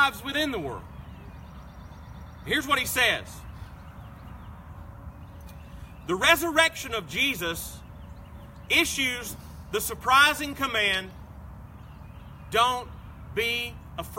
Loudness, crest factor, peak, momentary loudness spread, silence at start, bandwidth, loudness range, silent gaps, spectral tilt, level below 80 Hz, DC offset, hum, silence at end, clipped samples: -24 LUFS; 24 dB; -4 dBFS; 24 LU; 0 s; 16.5 kHz; 5 LU; none; -2.5 dB/octave; -46 dBFS; under 0.1%; none; 0 s; under 0.1%